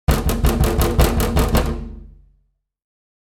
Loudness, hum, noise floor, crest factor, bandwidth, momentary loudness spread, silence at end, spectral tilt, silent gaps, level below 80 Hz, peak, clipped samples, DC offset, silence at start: -19 LUFS; none; -64 dBFS; 18 dB; 18 kHz; 10 LU; 1.15 s; -5.5 dB/octave; none; -22 dBFS; -2 dBFS; under 0.1%; under 0.1%; 0.1 s